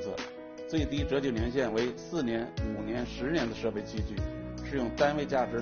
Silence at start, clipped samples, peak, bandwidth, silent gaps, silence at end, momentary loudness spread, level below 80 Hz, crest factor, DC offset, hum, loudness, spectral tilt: 0 s; under 0.1%; -14 dBFS; 7 kHz; none; 0 s; 9 LU; -44 dBFS; 18 dB; under 0.1%; none; -32 LUFS; -5 dB/octave